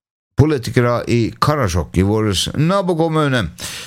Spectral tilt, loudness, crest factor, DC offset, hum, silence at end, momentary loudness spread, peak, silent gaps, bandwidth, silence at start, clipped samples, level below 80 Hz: -5.5 dB/octave; -17 LUFS; 16 dB; under 0.1%; none; 0 s; 3 LU; 0 dBFS; none; 16.5 kHz; 0.4 s; under 0.1%; -36 dBFS